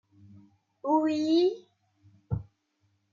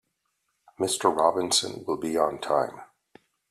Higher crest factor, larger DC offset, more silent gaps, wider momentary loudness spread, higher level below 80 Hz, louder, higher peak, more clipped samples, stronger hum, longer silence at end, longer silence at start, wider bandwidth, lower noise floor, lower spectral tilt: second, 16 dB vs 22 dB; neither; neither; first, 13 LU vs 9 LU; first, -58 dBFS vs -68 dBFS; about the same, -28 LUFS vs -26 LUFS; second, -14 dBFS vs -6 dBFS; neither; neither; about the same, 0.7 s vs 0.65 s; about the same, 0.85 s vs 0.8 s; second, 7.4 kHz vs 15 kHz; second, -73 dBFS vs -77 dBFS; first, -7 dB/octave vs -2.5 dB/octave